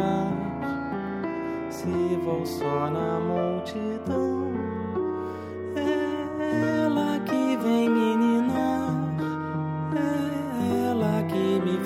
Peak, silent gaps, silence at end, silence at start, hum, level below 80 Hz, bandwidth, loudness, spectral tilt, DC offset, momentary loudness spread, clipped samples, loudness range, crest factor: -12 dBFS; none; 0 s; 0 s; none; -58 dBFS; 16 kHz; -27 LUFS; -7 dB/octave; under 0.1%; 8 LU; under 0.1%; 4 LU; 14 dB